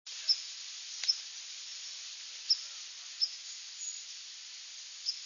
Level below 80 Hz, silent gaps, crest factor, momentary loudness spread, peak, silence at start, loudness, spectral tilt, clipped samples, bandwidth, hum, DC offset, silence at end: under -90 dBFS; none; 24 dB; 13 LU; -16 dBFS; 0.05 s; -36 LUFS; 7.5 dB/octave; under 0.1%; 7.4 kHz; none; under 0.1%; 0 s